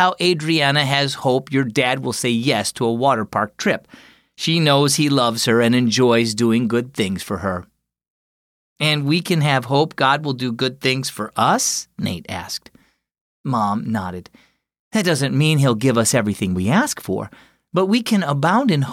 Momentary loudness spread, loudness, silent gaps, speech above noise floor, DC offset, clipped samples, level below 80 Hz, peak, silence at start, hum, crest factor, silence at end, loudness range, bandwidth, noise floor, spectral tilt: 10 LU; -18 LUFS; 8.10-8.76 s, 13.21-13.44 s, 14.79-14.91 s; over 72 dB; under 0.1%; under 0.1%; -58 dBFS; -4 dBFS; 0 s; none; 16 dB; 0 s; 5 LU; 16 kHz; under -90 dBFS; -4.5 dB/octave